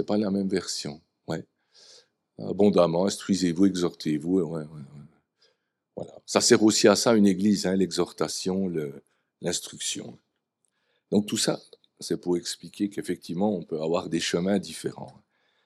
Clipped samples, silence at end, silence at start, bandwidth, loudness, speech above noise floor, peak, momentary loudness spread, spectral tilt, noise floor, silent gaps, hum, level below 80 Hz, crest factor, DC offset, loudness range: under 0.1%; 0.55 s; 0 s; 14.5 kHz; -26 LUFS; 51 dB; -4 dBFS; 18 LU; -4.5 dB/octave; -77 dBFS; none; none; -68 dBFS; 22 dB; under 0.1%; 8 LU